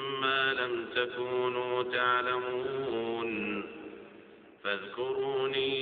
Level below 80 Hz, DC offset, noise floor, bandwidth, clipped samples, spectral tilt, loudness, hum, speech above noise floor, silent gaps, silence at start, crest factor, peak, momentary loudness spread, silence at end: -72 dBFS; under 0.1%; -54 dBFS; 4.7 kHz; under 0.1%; -1 dB/octave; -31 LUFS; none; 22 dB; none; 0 s; 18 dB; -14 dBFS; 11 LU; 0 s